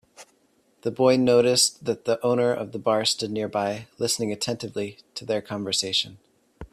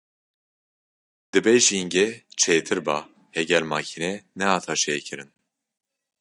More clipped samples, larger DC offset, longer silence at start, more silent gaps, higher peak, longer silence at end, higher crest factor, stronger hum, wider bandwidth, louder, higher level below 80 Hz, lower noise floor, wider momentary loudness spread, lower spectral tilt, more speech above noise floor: neither; neither; second, 0.2 s vs 1.35 s; neither; second, -6 dBFS vs -2 dBFS; second, 0.05 s vs 0.95 s; about the same, 18 dB vs 22 dB; neither; first, 15 kHz vs 11.5 kHz; about the same, -24 LUFS vs -22 LUFS; first, -60 dBFS vs -70 dBFS; second, -64 dBFS vs under -90 dBFS; about the same, 14 LU vs 12 LU; about the same, -3.5 dB/octave vs -2.5 dB/octave; second, 40 dB vs over 67 dB